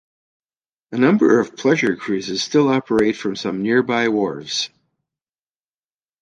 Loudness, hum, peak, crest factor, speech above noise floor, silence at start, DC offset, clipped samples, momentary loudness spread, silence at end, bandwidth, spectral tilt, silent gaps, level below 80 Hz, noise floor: -18 LUFS; none; -2 dBFS; 18 dB; over 72 dB; 0.9 s; under 0.1%; under 0.1%; 8 LU; 1.55 s; 10.5 kHz; -5 dB/octave; none; -60 dBFS; under -90 dBFS